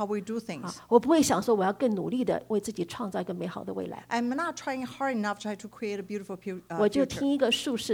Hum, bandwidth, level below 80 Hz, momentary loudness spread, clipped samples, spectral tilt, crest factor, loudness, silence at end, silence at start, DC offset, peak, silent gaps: none; 19.5 kHz; -64 dBFS; 12 LU; under 0.1%; -4.5 dB/octave; 20 dB; -29 LUFS; 0 s; 0 s; under 0.1%; -8 dBFS; none